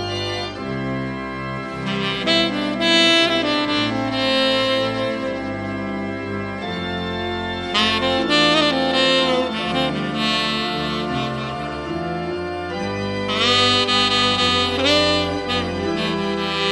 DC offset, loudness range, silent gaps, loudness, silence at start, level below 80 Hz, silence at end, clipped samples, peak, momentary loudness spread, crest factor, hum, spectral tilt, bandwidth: under 0.1%; 6 LU; none; -19 LUFS; 0 s; -46 dBFS; 0 s; under 0.1%; -2 dBFS; 11 LU; 18 dB; none; -4 dB/octave; 12 kHz